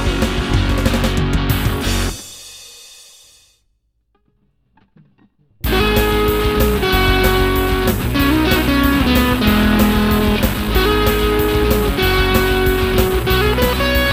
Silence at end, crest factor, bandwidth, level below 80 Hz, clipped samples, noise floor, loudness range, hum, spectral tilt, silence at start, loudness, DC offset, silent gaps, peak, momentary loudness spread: 0 s; 16 dB; 16.5 kHz; -22 dBFS; under 0.1%; -64 dBFS; 9 LU; none; -5 dB/octave; 0 s; -15 LUFS; 0.2%; none; 0 dBFS; 5 LU